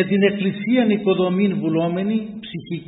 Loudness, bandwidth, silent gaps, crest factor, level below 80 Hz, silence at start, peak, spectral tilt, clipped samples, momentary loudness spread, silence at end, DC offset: -20 LUFS; 4 kHz; none; 18 dB; -60 dBFS; 0 s; -2 dBFS; -12 dB/octave; under 0.1%; 10 LU; 0.05 s; under 0.1%